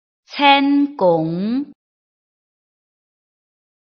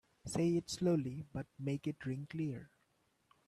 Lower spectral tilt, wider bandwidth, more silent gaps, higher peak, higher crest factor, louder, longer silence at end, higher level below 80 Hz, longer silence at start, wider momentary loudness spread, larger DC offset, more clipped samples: second, -3 dB/octave vs -6.5 dB/octave; second, 6.2 kHz vs 13.5 kHz; neither; first, 0 dBFS vs -24 dBFS; about the same, 20 dB vs 16 dB; first, -16 LUFS vs -39 LUFS; first, 2.2 s vs 0.8 s; about the same, -66 dBFS vs -68 dBFS; about the same, 0.3 s vs 0.25 s; first, 15 LU vs 10 LU; neither; neither